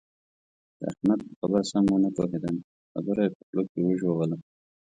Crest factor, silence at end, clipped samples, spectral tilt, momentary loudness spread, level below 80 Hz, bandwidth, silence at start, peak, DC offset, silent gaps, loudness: 18 dB; 0.45 s; under 0.1%; -7.5 dB/octave; 12 LU; -60 dBFS; 9.6 kHz; 0.8 s; -10 dBFS; under 0.1%; 1.36-1.42 s, 2.64-2.95 s, 3.35-3.53 s, 3.69-3.75 s; -27 LUFS